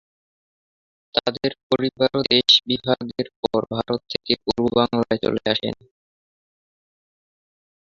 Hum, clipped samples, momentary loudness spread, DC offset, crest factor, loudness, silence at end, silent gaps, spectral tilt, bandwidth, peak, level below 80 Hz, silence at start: none; under 0.1%; 11 LU; under 0.1%; 22 dB; -21 LUFS; 2.1 s; 1.63-1.70 s, 3.36-3.43 s; -5 dB/octave; 7.8 kHz; -2 dBFS; -54 dBFS; 1.15 s